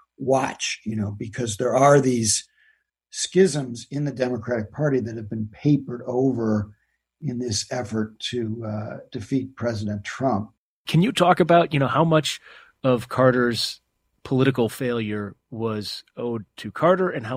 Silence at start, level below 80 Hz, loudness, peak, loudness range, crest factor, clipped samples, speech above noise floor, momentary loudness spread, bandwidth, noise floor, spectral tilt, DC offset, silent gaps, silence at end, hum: 0.2 s; -58 dBFS; -23 LUFS; 0 dBFS; 7 LU; 22 dB; under 0.1%; 41 dB; 13 LU; 16 kHz; -64 dBFS; -5 dB/octave; under 0.1%; 10.58-10.85 s; 0 s; none